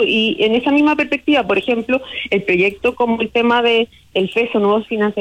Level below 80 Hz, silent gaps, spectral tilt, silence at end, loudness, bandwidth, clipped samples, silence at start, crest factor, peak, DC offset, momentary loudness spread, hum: -52 dBFS; none; -6 dB/octave; 0 s; -16 LUFS; 10.5 kHz; under 0.1%; 0 s; 12 dB; -4 dBFS; under 0.1%; 5 LU; none